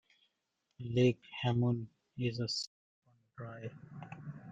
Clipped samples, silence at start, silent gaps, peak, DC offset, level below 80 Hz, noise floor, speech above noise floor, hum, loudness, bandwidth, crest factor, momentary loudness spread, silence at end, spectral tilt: under 0.1%; 0.8 s; 2.67-3.02 s; -18 dBFS; under 0.1%; -70 dBFS; -84 dBFS; 49 dB; none; -35 LUFS; 9 kHz; 20 dB; 19 LU; 0 s; -6.5 dB/octave